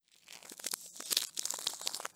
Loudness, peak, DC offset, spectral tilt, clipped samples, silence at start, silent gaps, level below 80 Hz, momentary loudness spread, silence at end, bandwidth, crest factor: -36 LUFS; -8 dBFS; under 0.1%; 2 dB/octave; under 0.1%; 0.25 s; none; -90 dBFS; 17 LU; 0.05 s; over 20 kHz; 32 dB